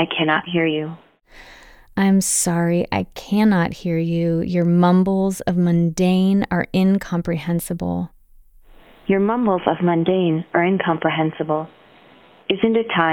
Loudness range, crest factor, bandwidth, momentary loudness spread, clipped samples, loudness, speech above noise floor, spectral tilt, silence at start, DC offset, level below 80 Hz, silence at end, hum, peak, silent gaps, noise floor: 4 LU; 18 dB; 17.5 kHz; 9 LU; under 0.1%; -19 LUFS; 31 dB; -5.5 dB/octave; 0 s; under 0.1%; -48 dBFS; 0 s; none; 0 dBFS; none; -49 dBFS